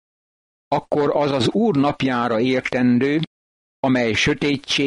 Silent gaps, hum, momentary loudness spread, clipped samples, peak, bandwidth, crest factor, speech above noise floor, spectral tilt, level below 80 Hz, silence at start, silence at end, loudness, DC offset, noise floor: 3.27-3.83 s; none; 7 LU; under 0.1%; -8 dBFS; 11 kHz; 12 dB; over 71 dB; -5.5 dB/octave; -50 dBFS; 0.7 s; 0 s; -19 LUFS; under 0.1%; under -90 dBFS